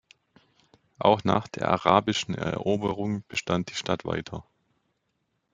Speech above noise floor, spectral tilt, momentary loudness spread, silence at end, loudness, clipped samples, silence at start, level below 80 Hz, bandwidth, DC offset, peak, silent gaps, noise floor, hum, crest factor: 50 dB; -5.5 dB/octave; 10 LU; 1.15 s; -26 LUFS; under 0.1%; 1 s; -60 dBFS; 9.4 kHz; under 0.1%; -4 dBFS; none; -76 dBFS; none; 24 dB